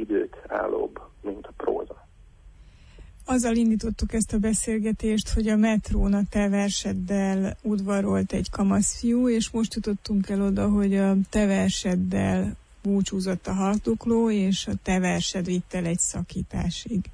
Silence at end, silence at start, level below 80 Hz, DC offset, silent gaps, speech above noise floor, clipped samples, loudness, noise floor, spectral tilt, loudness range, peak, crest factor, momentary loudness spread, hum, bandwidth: 0 s; 0 s; -38 dBFS; under 0.1%; none; 27 dB; under 0.1%; -25 LUFS; -51 dBFS; -5.5 dB/octave; 4 LU; -12 dBFS; 12 dB; 7 LU; none; 11 kHz